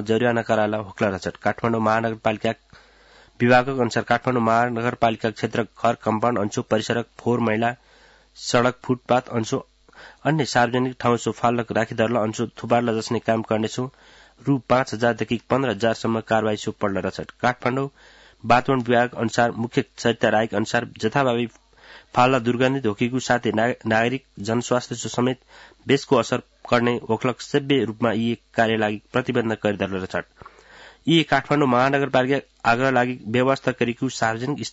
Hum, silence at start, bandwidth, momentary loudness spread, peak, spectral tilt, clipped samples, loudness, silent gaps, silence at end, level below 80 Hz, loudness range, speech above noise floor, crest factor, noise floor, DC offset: none; 0 s; 8 kHz; 7 LU; -4 dBFS; -5.5 dB/octave; under 0.1%; -22 LUFS; none; 0 s; -56 dBFS; 3 LU; 30 dB; 18 dB; -52 dBFS; under 0.1%